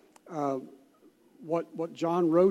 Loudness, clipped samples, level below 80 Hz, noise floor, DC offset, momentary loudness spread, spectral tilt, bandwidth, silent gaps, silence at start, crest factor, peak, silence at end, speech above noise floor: -31 LUFS; under 0.1%; -82 dBFS; -61 dBFS; under 0.1%; 19 LU; -8 dB/octave; 11 kHz; none; 0.3 s; 18 dB; -12 dBFS; 0 s; 34 dB